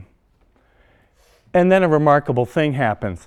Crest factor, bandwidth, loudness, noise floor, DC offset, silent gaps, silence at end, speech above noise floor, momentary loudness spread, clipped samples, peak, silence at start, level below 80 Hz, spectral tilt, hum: 18 dB; 12 kHz; -17 LUFS; -58 dBFS; under 0.1%; none; 0.1 s; 42 dB; 7 LU; under 0.1%; -2 dBFS; 0 s; -50 dBFS; -8 dB/octave; none